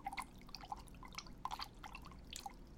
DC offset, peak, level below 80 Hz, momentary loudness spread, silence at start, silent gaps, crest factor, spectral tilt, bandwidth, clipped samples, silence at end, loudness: under 0.1%; -28 dBFS; -60 dBFS; 7 LU; 0 s; none; 24 dB; -2.5 dB/octave; 16.5 kHz; under 0.1%; 0 s; -51 LUFS